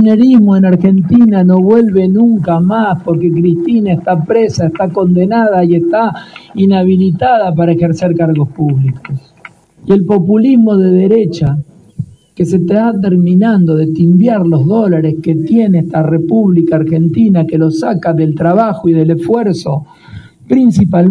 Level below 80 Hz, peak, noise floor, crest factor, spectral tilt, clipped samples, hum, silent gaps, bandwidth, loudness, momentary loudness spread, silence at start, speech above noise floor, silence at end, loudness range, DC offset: -44 dBFS; 0 dBFS; -38 dBFS; 10 dB; -9 dB/octave; 0.4%; none; none; 9.4 kHz; -10 LUFS; 7 LU; 0 s; 29 dB; 0 s; 2 LU; under 0.1%